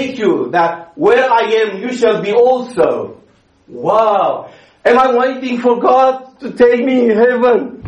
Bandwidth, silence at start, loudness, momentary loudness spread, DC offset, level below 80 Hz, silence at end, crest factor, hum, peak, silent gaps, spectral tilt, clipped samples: 9.4 kHz; 0 s; -13 LUFS; 7 LU; under 0.1%; -54 dBFS; 0 s; 12 dB; none; 0 dBFS; none; -5.5 dB/octave; under 0.1%